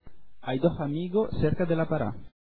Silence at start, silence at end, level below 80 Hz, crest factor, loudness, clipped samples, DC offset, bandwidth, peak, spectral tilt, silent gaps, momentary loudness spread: 0 s; 0.15 s; -46 dBFS; 18 dB; -28 LUFS; under 0.1%; under 0.1%; 4.6 kHz; -10 dBFS; -11.5 dB/octave; none; 7 LU